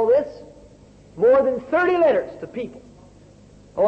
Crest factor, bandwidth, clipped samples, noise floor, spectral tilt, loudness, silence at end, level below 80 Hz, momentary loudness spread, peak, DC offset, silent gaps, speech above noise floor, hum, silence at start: 12 dB; 8 kHz; under 0.1%; -48 dBFS; -7 dB/octave; -19 LUFS; 0 s; -54 dBFS; 17 LU; -8 dBFS; under 0.1%; none; 29 dB; 50 Hz at -50 dBFS; 0 s